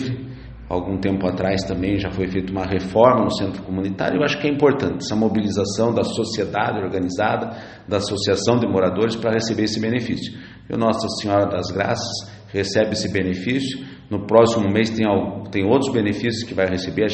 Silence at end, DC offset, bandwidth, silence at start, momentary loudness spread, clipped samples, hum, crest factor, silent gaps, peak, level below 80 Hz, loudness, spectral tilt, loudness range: 0 s; under 0.1%; 8.8 kHz; 0 s; 10 LU; under 0.1%; none; 20 dB; none; 0 dBFS; -46 dBFS; -21 LUFS; -5.5 dB/octave; 3 LU